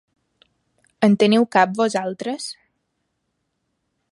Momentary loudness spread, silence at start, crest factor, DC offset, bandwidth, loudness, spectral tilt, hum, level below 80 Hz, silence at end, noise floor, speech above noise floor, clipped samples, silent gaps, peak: 13 LU; 1 s; 22 dB; under 0.1%; 11.5 kHz; -19 LUFS; -5.5 dB/octave; none; -70 dBFS; 1.6 s; -74 dBFS; 56 dB; under 0.1%; none; -2 dBFS